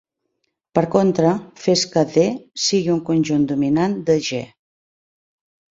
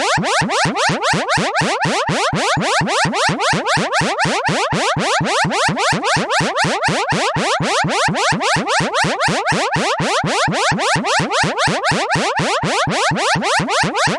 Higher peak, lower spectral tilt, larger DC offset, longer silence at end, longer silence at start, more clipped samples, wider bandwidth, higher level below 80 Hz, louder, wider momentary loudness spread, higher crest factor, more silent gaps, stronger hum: first, 0 dBFS vs -4 dBFS; first, -5 dB/octave vs -3.5 dB/octave; neither; first, 1.3 s vs 0 s; first, 0.75 s vs 0 s; neither; second, 7.8 kHz vs 11.5 kHz; second, -58 dBFS vs -46 dBFS; second, -19 LUFS vs -16 LUFS; first, 6 LU vs 2 LU; first, 20 dB vs 14 dB; neither; neither